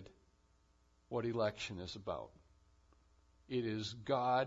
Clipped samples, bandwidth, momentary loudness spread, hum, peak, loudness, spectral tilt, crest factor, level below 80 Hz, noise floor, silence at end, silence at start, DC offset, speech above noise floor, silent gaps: under 0.1%; 7.4 kHz; 9 LU; none; -20 dBFS; -40 LUFS; -4.5 dB/octave; 20 dB; -70 dBFS; -72 dBFS; 0 s; 0 s; under 0.1%; 34 dB; none